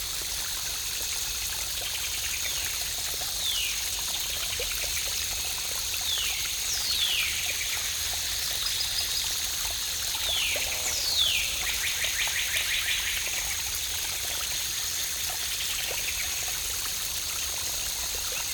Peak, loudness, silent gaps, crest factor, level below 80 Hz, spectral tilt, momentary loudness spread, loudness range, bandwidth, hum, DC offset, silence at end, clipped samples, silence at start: -10 dBFS; -26 LUFS; none; 20 dB; -48 dBFS; 1 dB/octave; 4 LU; 3 LU; 19.5 kHz; none; under 0.1%; 0 s; under 0.1%; 0 s